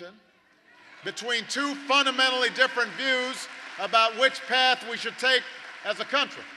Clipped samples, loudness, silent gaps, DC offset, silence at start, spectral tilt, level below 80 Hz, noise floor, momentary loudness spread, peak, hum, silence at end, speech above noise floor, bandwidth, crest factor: under 0.1%; -24 LUFS; none; under 0.1%; 0 s; -1 dB/octave; -84 dBFS; -61 dBFS; 13 LU; -6 dBFS; none; 0 s; 35 dB; 13 kHz; 20 dB